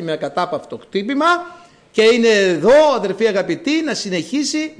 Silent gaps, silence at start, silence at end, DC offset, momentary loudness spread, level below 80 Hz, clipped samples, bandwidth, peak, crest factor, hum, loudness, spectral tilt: none; 0 s; 0.1 s; under 0.1%; 12 LU; -56 dBFS; under 0.1%; 10.5 kHz; -4 dBFS; 12 dB; none; -16 LUFS; -4 dB/octave